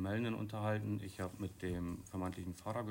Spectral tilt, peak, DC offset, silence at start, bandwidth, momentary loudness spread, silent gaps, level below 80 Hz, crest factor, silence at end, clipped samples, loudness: -7 dB/octave; -26 dBFS; under 0.1%; 0 s; 16 kHz; 5 LU; none; -62 dBFS; 14 dB; 0 s; under 0.1%; -42 LUFS